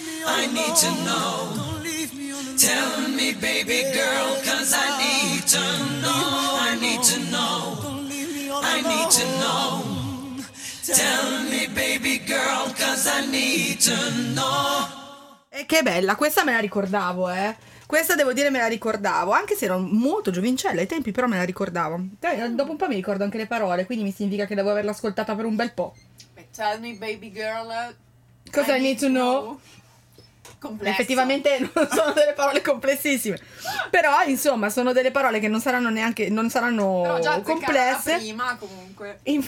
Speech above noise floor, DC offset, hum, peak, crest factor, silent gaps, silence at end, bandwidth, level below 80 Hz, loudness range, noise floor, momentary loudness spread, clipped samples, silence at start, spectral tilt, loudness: 30 dB; under 0.1%; none; -2 dBFS; 20 dB; none; 0 s; 17.5 kHz; -60 dBFS; 5 LU; -53 dBFS; 11 LU; under 0.1%; 0 s; -2.5 dB/octave; -22 LUFS